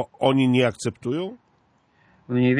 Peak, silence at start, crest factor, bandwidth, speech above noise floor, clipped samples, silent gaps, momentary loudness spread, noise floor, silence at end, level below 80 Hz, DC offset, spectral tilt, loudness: -4 dBFS; 0 s; 18 dB; 10.5 kHz; 42 dB; under 0.1%; none; 11 LU; -63 dBFS; 0 s; -62 dBFS; under 0.1%; -6.5 dB/octave; -23 LUFS